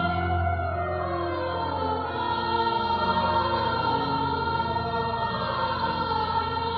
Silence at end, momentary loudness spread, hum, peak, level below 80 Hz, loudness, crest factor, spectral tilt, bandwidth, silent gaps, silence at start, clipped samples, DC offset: 0 s; 4 LU; none; -12 dBFS; -44 dBFS; -26 LUFS; 16 dB; -4 dB/octave; 5.8 kHz; none; 0 s; under 0.1%; under 0.1%